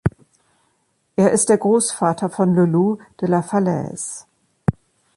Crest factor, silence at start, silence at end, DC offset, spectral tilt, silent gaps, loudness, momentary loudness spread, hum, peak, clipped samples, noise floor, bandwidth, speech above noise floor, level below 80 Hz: 16 dB; 0.05 s; 0.45 s; under 0.1%; -6 dB/octave; none; -19 LUFS; 12 LU; none; -4 dBFS; under 0.1%; -66 dBFS; 11.5 kHz; 49 dB; -46 dBFS